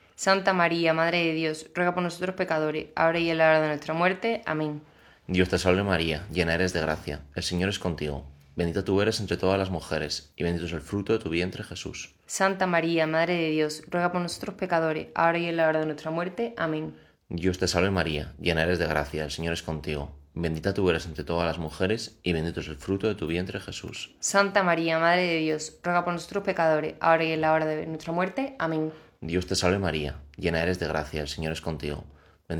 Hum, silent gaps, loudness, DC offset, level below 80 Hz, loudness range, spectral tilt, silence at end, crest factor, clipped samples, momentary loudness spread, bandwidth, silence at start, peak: none; none; -27 LUFS; under 0.1%; -50 dBFS; 4 LU; -5 dB/octave; 0 s; 22 dB; under 0.1%; 10 LU; 18.5 kHz; 0.2 s; -6 dBFS